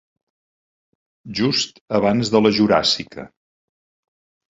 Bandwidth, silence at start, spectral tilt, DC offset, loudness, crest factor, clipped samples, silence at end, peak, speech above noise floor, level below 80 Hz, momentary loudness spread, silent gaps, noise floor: 8 kHz; 1.25 s; -4.5 dB/octave; under 0.1%; -18 LUFS; 20 dB; under 0.1%; 1.25 s; -2 dBFS; over 72 dB; -54 dBFS; 14 LU; 1.81-1.88 s; under -90 dBFS